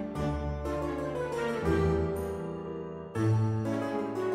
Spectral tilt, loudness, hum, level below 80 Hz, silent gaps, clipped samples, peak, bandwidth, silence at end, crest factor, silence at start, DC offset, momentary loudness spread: -8 dB/octave; -32 LUFS; none; -44 dBFS; none; under 0.1%; -16 dBFS; 13 kHz; 0 s; 14 dB; 0 s; under 0.1%; 10 LU